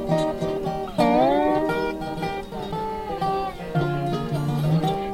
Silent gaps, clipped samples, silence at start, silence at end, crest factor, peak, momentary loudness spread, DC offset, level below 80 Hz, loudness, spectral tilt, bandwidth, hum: none; under 0.1%; 0 s; 0 s; 16 dB; -8 dBFS; 10 LU; under 0.1%; -44 dBFS; -24 LUFS; -7.5 dB/octave; 16 kHz; none